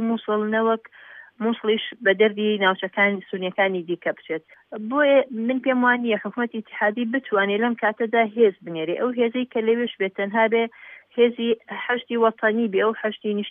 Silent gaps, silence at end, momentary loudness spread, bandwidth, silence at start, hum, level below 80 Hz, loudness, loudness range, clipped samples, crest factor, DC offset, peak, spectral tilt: none; 0 s; 9 LU; 3.8 kHz; 0 s; none; -84 dBFS; -22 LUFS; 1 LU; under 0.1%; 16 dB; under 0.1%; -6 dBFS; -8.5 dB/octave